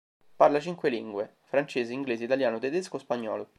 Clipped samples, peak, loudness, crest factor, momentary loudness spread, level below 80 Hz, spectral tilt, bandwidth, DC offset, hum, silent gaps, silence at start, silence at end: under 0.1%; -8 dBFS; -29 LUFS; 22 dB; 10 LU; -78 dBFS; -5.5 dB/octave; 11.5 kHz; under 0.1%; none; none; 0.4 s; 0.15 s